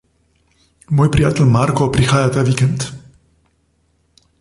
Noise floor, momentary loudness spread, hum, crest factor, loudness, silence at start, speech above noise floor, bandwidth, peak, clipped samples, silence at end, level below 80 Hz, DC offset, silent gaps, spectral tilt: -61 dBFS; 6 LU; none; 16 dB; -15 LUFS; 0.9 s; 47 dB; 11.5 kHz; -2 dBFS; under 0.1%; 1.4 s; -36 dBFS; under 0.1%; none; -6.5 dB/octave